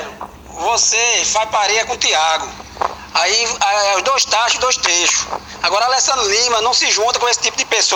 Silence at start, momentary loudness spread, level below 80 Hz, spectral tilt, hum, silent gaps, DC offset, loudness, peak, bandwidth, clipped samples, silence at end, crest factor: 0 s; 11 LU; -48 dBFS; 1 dB/octave; none; none; under 0.1%; -14 LUFS; 0 dBFS; over 20 kHz; under 0.1%; 0 s; 16 dB